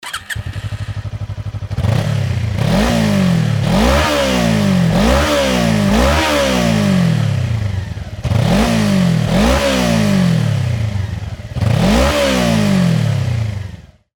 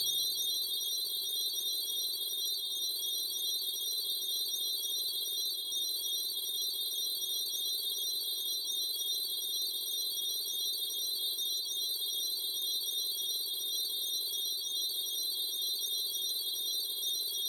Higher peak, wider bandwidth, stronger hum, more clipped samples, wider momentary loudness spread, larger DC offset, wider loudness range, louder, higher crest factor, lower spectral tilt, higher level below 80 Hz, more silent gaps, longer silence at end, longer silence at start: first, -2 dBFS vs -22 dBFS; about the same, 19.5 kHz vs 19.5 kHz; neither; neither; first, 12 LU vs 1 LU; neither; about the same, 2 LU vs 0 LU; first, -15 LUFS vs -32 LUFS; about the same, 14 dB vs 14 dB; first, -6 dB/octave vs 2.5 dB/octave; first, -26 dBFS vs -86 dBFS; neither; first, 0.35 s vs 0 s; about the same, 0.05 s vs 0 s